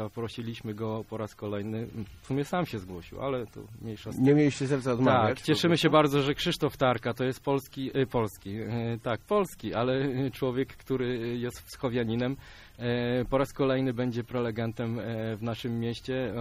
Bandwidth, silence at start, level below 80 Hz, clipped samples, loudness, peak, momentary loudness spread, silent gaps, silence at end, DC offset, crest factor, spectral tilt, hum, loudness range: 15.5 kHz; 0 s; -54 dBFS; under 0.1%; -29 LUFS; -8 dBFS; 13 LU; none; 0 s; under 0.1%; 20 dB; -6.5 dB/octave; none; 7 LU